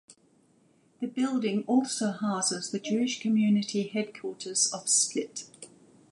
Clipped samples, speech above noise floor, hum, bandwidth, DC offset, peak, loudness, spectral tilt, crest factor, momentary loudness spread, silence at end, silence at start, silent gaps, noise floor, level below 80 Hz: under 0.1%; 36 dB; none; 11.5 kHz; under 0.1%; -10 dBFS; -28 LUFS; -3.5 dB/octave; 20 dB; 14 LU; 0.45 s; 0.1 s; none; -64 dBFS; -80 dBFS